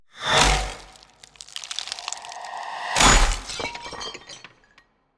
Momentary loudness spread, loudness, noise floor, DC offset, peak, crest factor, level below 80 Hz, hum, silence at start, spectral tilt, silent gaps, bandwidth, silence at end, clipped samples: 23 LU; -22 LUFS; -60 dBFS; under 0.1%; -4 dBFS; 20 dB; -30 dBFS; none; 0.15 s; -2 dB/octave; none; 11 kHz; 0.8 s; under 0.1%